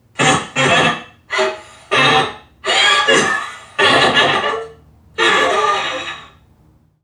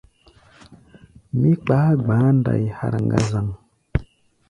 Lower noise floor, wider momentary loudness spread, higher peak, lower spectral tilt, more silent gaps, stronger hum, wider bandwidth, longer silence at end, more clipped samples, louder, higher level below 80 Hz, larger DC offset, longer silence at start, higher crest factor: about the same, -52 dBFS vs -53 dBFS; first, 15 LU vs 11 LU; about the same, 0 dBFS vs 0 dBFS; second, -2.5 dB/octave vs -8.5 dB/octave; neither; neither; first, 13.5 kHz vs 10.5 kHz; first, 0.8 s vs 0.45 s; neither; first, -14 LUFS vs -20 LUFS; second, -52 dBFS vs -40 dBFS; neither; second, 0.2 s vs 0.7 s; about the same, 16 dB vs 20 dB